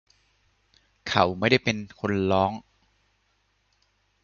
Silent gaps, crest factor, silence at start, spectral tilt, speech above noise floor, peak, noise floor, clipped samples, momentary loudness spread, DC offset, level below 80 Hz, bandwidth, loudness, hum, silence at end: none; 24 dB; 1.05 s; -5.5 dB/octave; 46 dB; -4 dBFS; -70 dBFS; under 0.1%; 10 LU; under 0.1%; -52 dBFS; 7.2 kHz; -24 LUFS; none; 1.65 s